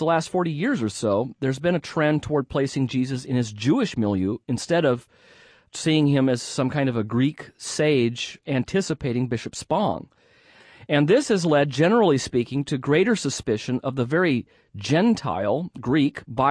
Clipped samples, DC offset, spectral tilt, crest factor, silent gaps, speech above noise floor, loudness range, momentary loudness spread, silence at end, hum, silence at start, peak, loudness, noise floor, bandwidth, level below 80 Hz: under 0.1%; under 0.1%; -6 dB/octave; 16 dB; none; 32 dB; 3 LU; 7 LU; 0 s; none; 0 s; -6 dBFS; -23 LUFS; -54 dBFS; 11 kHz; -56 dBFS